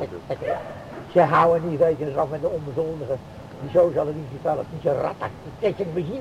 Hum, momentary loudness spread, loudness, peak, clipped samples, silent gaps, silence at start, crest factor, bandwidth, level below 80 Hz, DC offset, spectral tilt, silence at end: none; 13 LU; -24 LUFS; -4 dBFS; under 0.1%; none; 0 s; 18 dB; 10.5 kHz; -52 dBFS; under 0.1%; -8 dB/octave; 0 s